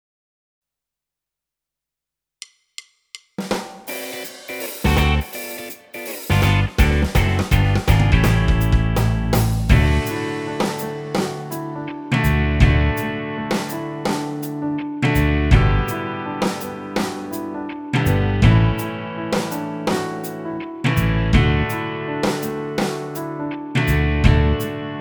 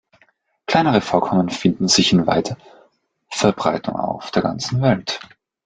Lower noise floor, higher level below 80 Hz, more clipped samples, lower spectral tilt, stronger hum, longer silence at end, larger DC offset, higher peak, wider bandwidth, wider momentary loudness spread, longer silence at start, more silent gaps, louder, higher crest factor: first, -86 dBFS vs -60 dBFS; first, -26 dBFS vs -52 dBFS; neither; first, -6 dB/octave vs -4.5 dB/octave; neither; second, 0 s vs 0.45 s; neither; about the same, 0 dBFS vs -2 dBFS; first, over 20 kHz vs 9.4 kHz; about the same, 13 LU vs 13 LU; first, 3.15 s vs 0.7 s; neither; about the same, -20 LUFS vs -19 LUFS; about the same, 20 dB vs 18 dB